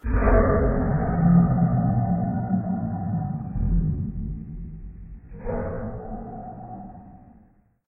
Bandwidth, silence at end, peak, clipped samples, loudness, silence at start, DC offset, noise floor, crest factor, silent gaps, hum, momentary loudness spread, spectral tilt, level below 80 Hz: 2.6 kHz; 0.7 s; -6 dBFS; under 0.1%; -24 LUFS; 0.05 s; under 0.1%; -57 dBFS; 18 dB; none; none; 20 LU; -15 dB/octave; -30 dBFS